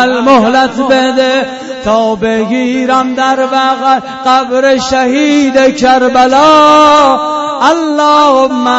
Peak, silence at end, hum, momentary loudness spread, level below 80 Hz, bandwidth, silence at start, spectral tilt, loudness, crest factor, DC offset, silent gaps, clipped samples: 0 dBFS; 0 s; none; 7 LU; -42 dBFS; 8.6 kHz; 0 s; -3.5 dB/octave; -8 LUFS; 8 dB; under 0.1%; none; 0.6%